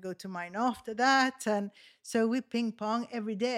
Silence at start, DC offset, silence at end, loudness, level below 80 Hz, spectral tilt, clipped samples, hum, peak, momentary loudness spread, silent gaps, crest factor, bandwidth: 0 s; under 0.1%; 0 s; -31 LUFS; -76 dBFS; -4 dB/octave; under 0.1%; none; -12 dBFS; 13 LU; none; 18 dB; 15 kHz